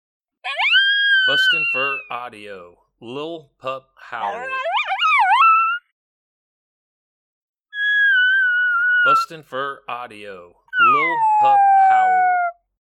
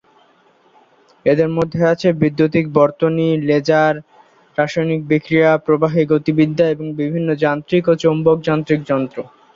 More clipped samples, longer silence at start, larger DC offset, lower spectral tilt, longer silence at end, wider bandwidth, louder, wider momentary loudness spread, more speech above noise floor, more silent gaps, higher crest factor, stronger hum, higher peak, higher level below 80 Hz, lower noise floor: neither; second, 0.45 s vs 1.25 s; neither; second, -2 dB/octave vs -8 dB/octave; about the same, 0.4 s vs 0.3 s; first, 13 kHz vs 7.4 kHz; about the same, -16 LUFS vs -16 LUFS; first, 19 LU vs 6 LU; first, over 71 dB vs 38 dB; first, 5.92-7.54 s, 7.60-7.64 s vs none; about the same, 14 dB vs 16 dB; neither; about the same, -4 dBFS vs -2 dBFS; second, -72 dBFS vs -54 dBFS; first, under -90 dBFS vs -54 dBFS